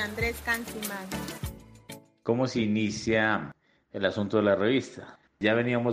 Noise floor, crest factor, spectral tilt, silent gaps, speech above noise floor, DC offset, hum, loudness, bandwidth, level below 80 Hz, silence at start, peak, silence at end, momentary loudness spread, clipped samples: -48 dBFS; 20 dB; -5.5 dB/octave; none; 21 dB; under 0.1%; none; -28 LUFS; 15.5 kHz; -50 dBFS; 0 s; -10 dBFS; 0 s; 18 LU; under 0.1%